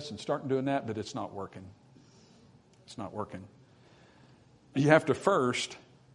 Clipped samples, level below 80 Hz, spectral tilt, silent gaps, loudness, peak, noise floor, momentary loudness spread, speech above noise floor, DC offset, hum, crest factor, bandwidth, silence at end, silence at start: under 0.1%; -72 dBFS; -5.5 dB/octave; none; -30 LUFS; -6 dBFS; -60 dBFS; 21 LU; 29 dB; under 0.1%; none; 26 dB; 11 kHz; 0.35 s; 0 s